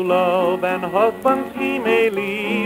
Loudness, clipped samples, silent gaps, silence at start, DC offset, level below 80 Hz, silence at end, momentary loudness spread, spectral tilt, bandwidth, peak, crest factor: -19 LUFS; under 0.1%; none; 0 s; under 0.1%; -58 dBFS; 0 s; 4 LU; -6 dB/octave; 16 kHz; -4 dBFS; 16 dB